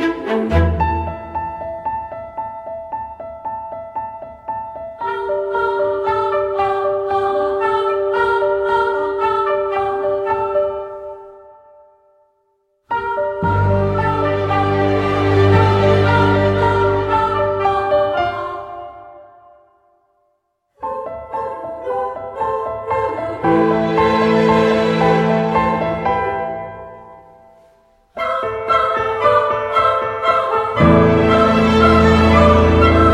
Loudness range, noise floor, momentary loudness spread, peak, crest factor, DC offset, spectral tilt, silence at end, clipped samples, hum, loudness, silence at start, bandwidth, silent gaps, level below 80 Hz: 12 LU; -67 dBFS; 16 LU; 0 dBFS; 16 dB; under 0.1%; -7.5 dB/octave; 0 s; under 0.1%; none; -16 LUFS; 0 s; 10.5 kHz; none; -32 dBFS